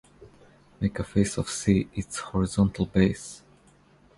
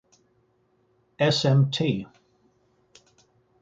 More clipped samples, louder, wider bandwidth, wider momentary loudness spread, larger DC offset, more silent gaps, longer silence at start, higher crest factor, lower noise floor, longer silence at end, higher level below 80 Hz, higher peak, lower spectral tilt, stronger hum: neither; second, -26 LUFS vs -23 LUFS; first, 11.5 kHz vs 7.8 kHz; about the same, 10 LU vs 11 LU; neither; neither; second, 0.2 s vs 1.2 s; about the same, 20 dB vs 20 dB; second, -58 dBFS vs -67 dBFS; second, 0.8 s vs 1.55 s; first, -44 dBFS vs -62 dBFS; about the same, -6 dBFS vs -8 dBFS; about the same, -6 dB/octave vs -6 dB/octave; neither